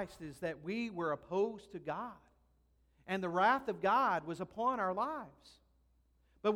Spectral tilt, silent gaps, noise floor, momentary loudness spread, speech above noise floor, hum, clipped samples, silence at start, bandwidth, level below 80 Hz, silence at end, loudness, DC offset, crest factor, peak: -6 dB/octave; none; -72 dBFS; 13 LU; 36 dB; none; under 0.1%; 0 s; 16 kHz; -70 dBFS; 0 s; -36 LUFS; under 0.1%; 18 dB; -18 dBFS